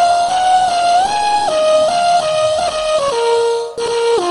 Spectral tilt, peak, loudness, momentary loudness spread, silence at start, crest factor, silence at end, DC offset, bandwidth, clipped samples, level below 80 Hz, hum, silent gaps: -2 dB/octave; -4 dBFS; -14 LUFS; 4 LU; 0 s; 10 dB; 0 s; under 0.1%; 11.5 kHz; under 0.1%; -48 dBFS; none; none